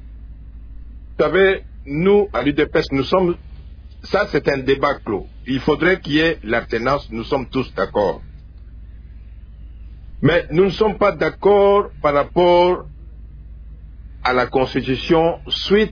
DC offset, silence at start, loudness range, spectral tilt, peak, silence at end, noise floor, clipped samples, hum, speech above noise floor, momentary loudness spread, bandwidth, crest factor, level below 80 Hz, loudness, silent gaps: under 0.1%; 0 s; 6 LU; -7 dB/octave; -4 dBFS; 0 s; -37 dBFS; under 0.1%; none; 20 dB; 10 LU; 5.4 kHz; 16 dB; -36 dBFS; -18 LUFS; none